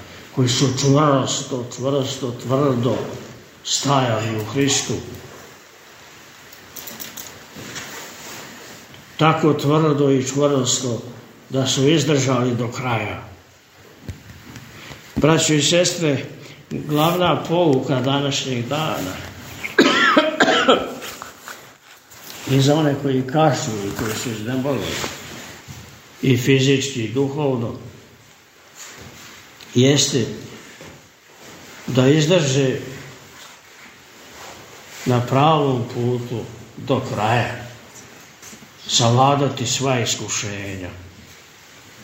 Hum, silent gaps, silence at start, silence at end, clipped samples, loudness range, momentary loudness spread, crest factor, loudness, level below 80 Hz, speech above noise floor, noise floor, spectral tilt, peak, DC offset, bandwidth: none; none; 0 s; 0 s; under 0.1%; 6 LU; 23 LU; 20 dB; -19 LUFS; -54 dBFS; 30 dB; -48 dBFS; -4.5 dB/octave; 0 dBFS; under 0.1%; 16 kHz